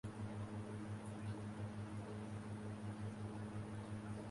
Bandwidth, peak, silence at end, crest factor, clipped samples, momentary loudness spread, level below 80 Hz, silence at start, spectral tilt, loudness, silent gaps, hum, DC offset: 11.5 kHz; -36 dBFS; 0 s; 12 dB; under 0.1%; 1 LU; -66 dBFS; 0.05 s; -7 dB/octave; -49 LUFS; none; none; under 0.1%